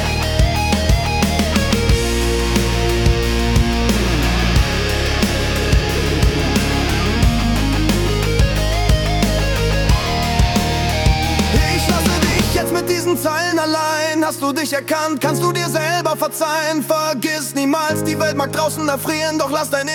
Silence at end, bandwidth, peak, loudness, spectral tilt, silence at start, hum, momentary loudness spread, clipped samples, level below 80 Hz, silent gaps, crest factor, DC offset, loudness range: 0 s; 18 kHz; -2 dBFS; -17 LUFS; -4.5 dB/octave; 0 s; none; 3 LU; under 0.1%; -22 dBFS; none; 14 dB; under 0.1%; 2 LU